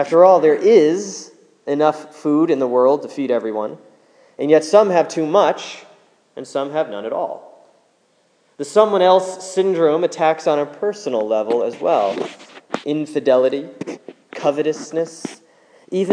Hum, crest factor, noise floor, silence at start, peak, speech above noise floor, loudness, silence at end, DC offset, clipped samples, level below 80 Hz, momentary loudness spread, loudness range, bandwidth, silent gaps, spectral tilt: none; 18 dB; -60 dBFS; 0 s; 0 dBFS; 43 dB; -17 LUFS; 0 s; under 0.1%; under 0.1%; -80 dBFS; 17 LU; 4 LU; 10.5 kHz; none; -5 dB/octave